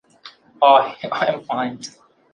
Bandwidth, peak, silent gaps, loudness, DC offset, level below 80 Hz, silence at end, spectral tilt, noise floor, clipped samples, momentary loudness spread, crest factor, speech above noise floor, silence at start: 9.6 kHz; -2 dBFS; none; -18 LUFS; under 0.1%; -70 dBFS; 0.45 s; -4 dB/octave; -46 dBFS; under 0.1%; 17 LU; 20 dB; 28 dB; 0.25 s